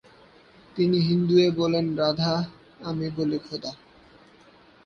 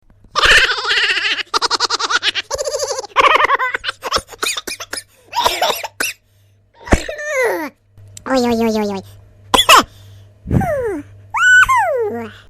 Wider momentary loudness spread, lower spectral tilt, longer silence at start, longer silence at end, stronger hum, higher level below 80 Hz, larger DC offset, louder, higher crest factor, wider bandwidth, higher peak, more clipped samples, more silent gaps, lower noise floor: about the same, 15 LU vs 15 LU; first, -7 dB/octave vs -2.5 dB/octave; first, 0.75 s vs 0.35 s; first, 1.1 s vs 0.1 s; neither; second, -60 dBFS vs -34 dBFS; neither; second, -24 LUFS vs -15 LUFS; about the same, 18 dB vs 16 dB; second, 6.8 kHz vs 16 kHz; second, -8 dBFS vs 0 dBFS; neither; neither; about the same, -54 dBFS vs -53 dBFS